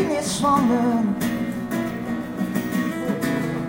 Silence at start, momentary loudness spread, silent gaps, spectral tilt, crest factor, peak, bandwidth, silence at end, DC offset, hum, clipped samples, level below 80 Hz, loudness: 0 s; 8 LU; none; -5.5 dB/octave; 14 dB; -8 dBFS; 17 kHz; 0 s; under 0.1%; none; under 0.1%; -50 dBFS; -23 LUFS